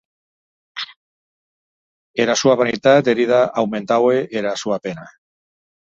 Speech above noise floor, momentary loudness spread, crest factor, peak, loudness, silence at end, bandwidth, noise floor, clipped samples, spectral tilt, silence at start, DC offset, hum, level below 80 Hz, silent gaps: over 73 dB; 16 LU; 18 dB; -2 dBFS; -17 LUFS; 0.8 s; 7.8 kHz; under -90 dBFS; under 0.1%; -4.5 dB/octave; 0.75 s; under 0.1%; none; -62 dBFS; 0.96-2.14 s